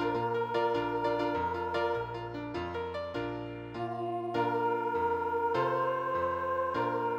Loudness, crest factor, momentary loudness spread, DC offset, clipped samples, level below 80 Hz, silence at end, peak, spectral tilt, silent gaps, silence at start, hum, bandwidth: -32 LUFS; 14 dB; 8 LU; under 0.1%; under 0.1%; -62 dBFS; 0 s; -18 dBFS; -7 dB/octave; none; 0 s; none; 14.5 kHz